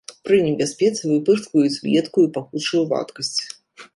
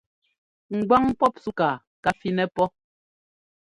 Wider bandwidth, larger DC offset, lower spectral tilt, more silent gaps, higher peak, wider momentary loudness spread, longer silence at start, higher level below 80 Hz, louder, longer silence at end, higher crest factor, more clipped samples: about the same, 11.5 kHz vs 11.5 kHz; neither; second, -5 dB/octave vs -7 dB/octave; second, none vs 1.87-2.03 s; about the same, -4 dBFS vs -6 dBFS; about the same, 7 LU vs 7 LU; second, 0.1 s vs 0.7 s; second, -64 dBFS vs -56 dBFS; first, -20 LUFS vs -24 LUFS; second, 0.1 s vs 1 s; about the same, 16 dB vs 20 dB; neither